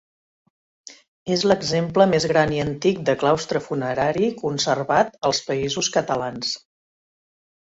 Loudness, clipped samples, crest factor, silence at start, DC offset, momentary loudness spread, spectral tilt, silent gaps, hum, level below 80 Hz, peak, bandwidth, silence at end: -21 LUFS; under 0.1%; 20 dB; 0.85 s; under 0.1%; 7 LU; -4.5 dB/octave; 1.08-1.26 s; none; -56 dBFS; -4 dBFS; 8 kHz; 1.15 s